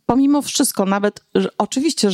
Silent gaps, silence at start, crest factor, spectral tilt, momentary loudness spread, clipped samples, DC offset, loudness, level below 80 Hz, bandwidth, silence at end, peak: none; 0.1 s; 16 dB; -4 dB/octave; 5 LU; under 0.1%; under 0.1%; -18 LUFS; -52 dBFS; 16 kHz; 0 s; -2 dBFS